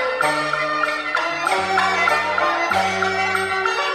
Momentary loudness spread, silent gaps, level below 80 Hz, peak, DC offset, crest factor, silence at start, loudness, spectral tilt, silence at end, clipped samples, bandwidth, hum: 3 LU; none; -58 dBFS; -6 dBFS; under 0.1%; 14 dB; 0 s; -19 LUFS; -2.5 dB/octave; 0 s; under 0.1%; 13 kHz; none